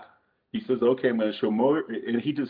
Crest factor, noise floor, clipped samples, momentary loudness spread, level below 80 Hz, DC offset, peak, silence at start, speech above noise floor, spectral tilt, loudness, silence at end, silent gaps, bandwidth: 14 dB; -60 dBFS; under 0.1%; 8 LU; -72 dBFS; under 0.1%; -12 dBFS; 0 s; 35 dB; -9.5 dB/octave; -26 LUFS; 0 s; none; 5 kHz